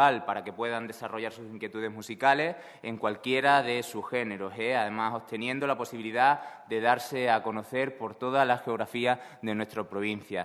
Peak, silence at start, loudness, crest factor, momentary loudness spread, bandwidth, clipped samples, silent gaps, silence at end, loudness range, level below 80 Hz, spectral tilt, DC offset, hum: -8 dBFS; 0 s; -29 LUFS; 22 dB; 11 LU; 14 kHz; under 0.1%; none; 0 s; 2 LU; -76 dBFS; -4.5 dB/octave; under 0.1%; none